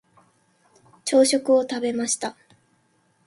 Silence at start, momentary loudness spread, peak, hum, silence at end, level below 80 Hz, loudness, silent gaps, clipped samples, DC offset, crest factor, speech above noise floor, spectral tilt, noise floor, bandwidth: 1.05 s; 12 LU; -6 dBFS; none; 0.95 s; -72 dBFS; -22 LUFS; none; under 0.1%; under 0.1%; 18 dB; 44 dB; -2 dB/octave; -65 dBFS; 11.5 kHz